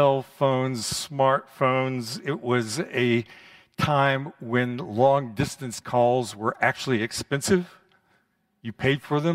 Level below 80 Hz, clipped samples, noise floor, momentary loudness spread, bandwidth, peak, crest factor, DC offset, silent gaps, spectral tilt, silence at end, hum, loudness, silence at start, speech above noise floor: -58 dBFS; under 0.1%; -68 dBFS; 8 LU; 16 kHz; -6 dBFS; 20 dB; under 0.1%; none; -5 dB/octave; 0 s; none; -25 LUFS; 0 s; 44 dB